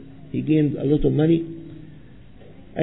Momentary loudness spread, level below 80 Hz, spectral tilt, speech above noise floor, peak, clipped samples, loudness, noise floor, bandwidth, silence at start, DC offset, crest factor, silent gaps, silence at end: 20 LU; -40 dBFS; -12.5 dB/octave; 26 dB; -6 dBFS; under 0.1%; -21 LUFS; -46 dBFS; 4.1 kHz; 0 s; 0.5%; 16 dB; none; 0 s